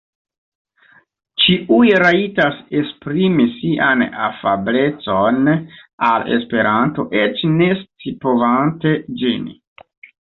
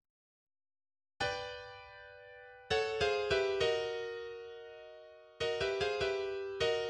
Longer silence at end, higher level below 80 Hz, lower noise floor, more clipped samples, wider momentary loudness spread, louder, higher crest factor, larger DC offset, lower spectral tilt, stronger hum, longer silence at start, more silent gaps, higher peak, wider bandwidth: first, 0.85 s vs 0 s; first, -54 dBFS vs -62 dBFS; about the same, -52 dBFS vs -55 dBFS; neither; second, 9 LU vs 20 LU; first, -16 LUFS vs -35 LUFS; about the same, 16 dB vs 18 dB; neither; first, -8 dB/octave vs -3.5 dB/octave; neither; first, 1.35 s vs 1.2 s; first, 5.93-5.98 s vs none; first, -2 dBFS vs -20 dBFS; second, 6.4 kHz vs 10.5 kHz